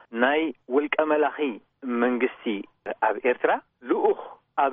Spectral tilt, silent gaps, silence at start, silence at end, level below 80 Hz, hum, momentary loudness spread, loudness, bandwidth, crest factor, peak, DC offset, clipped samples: -2 dB/octave; none; 0.1 s; 0 s; -76 dBFS; none; 9 LU; -25 LUFS; 3.8 kHz; 18 dB; -8 dBFS; under 0.1%; under 0.1%